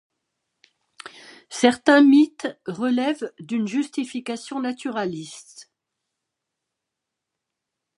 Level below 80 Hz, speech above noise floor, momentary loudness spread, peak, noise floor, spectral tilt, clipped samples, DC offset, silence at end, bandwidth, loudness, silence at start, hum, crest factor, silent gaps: -72 dBFS; 63 dB; 24 LU; -2 dBFS; -84 dBFS; -4.5 dB/octave; under 0.1%; under 0.1%; 2.35 s; 11.5 kHz; -21 LUFS; 1.05 s; none; 22 dB; none